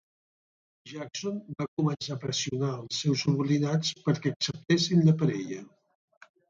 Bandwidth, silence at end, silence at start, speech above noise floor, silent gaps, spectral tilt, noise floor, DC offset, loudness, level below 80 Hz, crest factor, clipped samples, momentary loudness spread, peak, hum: 7.6 kHz; 0.85 s; 0.85 s; over 62 dB; 1.68-1.77 s, 4.36-4.40 s; -5.5 dB/octave; under -90 dBFS; under 0.1%; -28 LUFS; -68 dBFS; 18 dB; under 0.1%; 12 LU; -12 dBFS; none